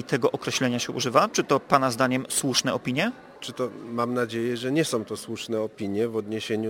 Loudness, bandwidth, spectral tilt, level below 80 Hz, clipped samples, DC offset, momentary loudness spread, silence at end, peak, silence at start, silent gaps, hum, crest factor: -25 LUFS; 17 kHz; -4 dB/octave; -66 dBFS; under 0.1%; under 0.1%; 9 LU; 0 s; -2 dBFS; 0 s; none; none; 24 dB